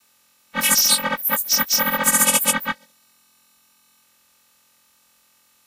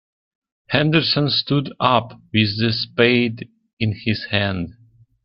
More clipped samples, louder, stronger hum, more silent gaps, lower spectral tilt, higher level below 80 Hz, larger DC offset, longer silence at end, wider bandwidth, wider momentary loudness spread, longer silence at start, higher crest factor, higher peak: neither; about the same, -17 LUFS vs -19 LUFS; neither; second, none vs 3.73-3.77 s; second, 0 dB/octave vs -9 dB/octave; second, -64 dBFS vs -52 dBFS; neither; first, 2.95 s vs 0.55 s; first, 16 kHz vs 5.8 kHz; first, 12 LU vs 9 LU; second, 0.55 s vs 0.7 s; about the same, 22 dB vs 20 dB; about the same, 0 dBFS vs 0 dBFS